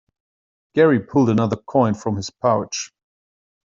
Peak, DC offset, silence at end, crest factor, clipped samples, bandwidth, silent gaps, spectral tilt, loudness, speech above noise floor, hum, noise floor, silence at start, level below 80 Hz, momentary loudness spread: -4 dBFS; under 0.1%; 0.95 s; 18 dB; under 0.1%; 7.8 kHz; none; -6 dB/octave; -19 LUFS; over 72 dB; none; under -90 dBFS; 0.75 s; -60 dBFS; 11 LU